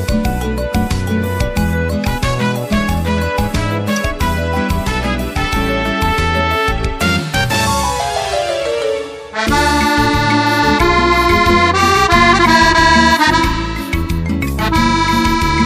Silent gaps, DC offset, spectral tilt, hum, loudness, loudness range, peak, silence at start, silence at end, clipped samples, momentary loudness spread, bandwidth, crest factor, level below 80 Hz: none; under 0.1%; -4.5 dB/octave; none; -14 LUFS; 7 LU; 0 dBFS; 0 s; 0 s; under 0.1%; 9 LU; 15.5 kHz; 14 dB; -24 dBFS